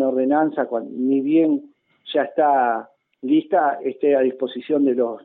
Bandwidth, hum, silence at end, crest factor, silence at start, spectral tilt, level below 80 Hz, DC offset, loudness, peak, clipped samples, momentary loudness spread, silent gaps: 4.1 kHz; none; 0.05 s; 14 dB; 0 s; -9.5 dB/octave; -74 dBFS; under 0.1%; -20 LUFS; -6 dBFS; under 0.1%; 8 LU; none